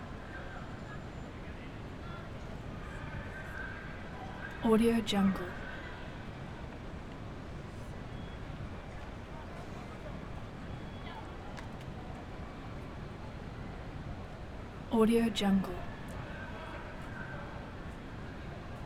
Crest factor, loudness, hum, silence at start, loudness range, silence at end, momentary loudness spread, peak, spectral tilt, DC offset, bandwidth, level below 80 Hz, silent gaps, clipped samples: 22 dB; -38 LUFS; none; 0 s; 11 LU; 0 s; 16 LU; -16 dBFS; -6.5 dB/octave; under 0.1%; 15.5 kHz; -48 dBFS; none; under 0.1%